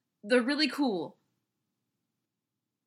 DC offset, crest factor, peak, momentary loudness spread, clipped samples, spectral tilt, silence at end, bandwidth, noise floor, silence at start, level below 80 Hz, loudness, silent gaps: under 0.1%; 20 dB; -14 dBFS; 11 LU; under 0.1%; -4 dB/octave; 1.75 s; 15 kHz; -87 dBFS; 0.25 s; under -90 dBFS; -29 LUFS; none